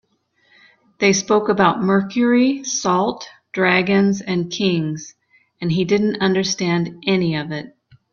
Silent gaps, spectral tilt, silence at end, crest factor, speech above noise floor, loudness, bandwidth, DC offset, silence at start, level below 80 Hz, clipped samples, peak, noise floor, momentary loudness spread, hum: none; -5 dB/octave; 0.45 s; 18 dB; 45 dB; -18 LUFS; 7.2 kHz; under 0.1%; 1 s; -58 dBFS; under 0.1%; 0 dBFS; -63 dBFS; 12 LU; none